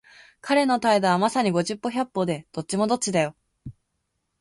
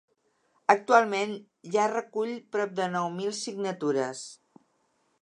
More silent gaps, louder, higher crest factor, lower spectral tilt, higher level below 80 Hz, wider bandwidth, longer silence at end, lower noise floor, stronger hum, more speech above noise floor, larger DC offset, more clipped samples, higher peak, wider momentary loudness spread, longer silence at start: neither; first, -23 LUFS vs -28 LUFS; second, 16 dB vs 24 dB; about the same, -4.5 dB/octave vs -4 dB/octave; first, -62 dBFS vs -84 dBFS; about the same, 11.5 kHz vs 11 kHz; second, 0.7 s vs 0.85 s; first, -77 dBFS vs -72 dBFS; neither; first, 54 dB vs 44 dB; neither; neither; second, -8 dBFS vs -4 dBFS; second, 9 LU vs 12 LU; second, 0.45 s vs 0.7 s